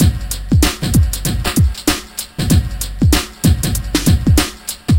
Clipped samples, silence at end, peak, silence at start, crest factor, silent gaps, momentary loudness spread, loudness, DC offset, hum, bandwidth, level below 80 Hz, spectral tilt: under 0.1%; 0 s; 0 dBFS; 0 s; 14 dB; none; 7 LU; -16 LUFS; 0.6%; none; 17 kHz; -20 dBFS; -5 dB/octave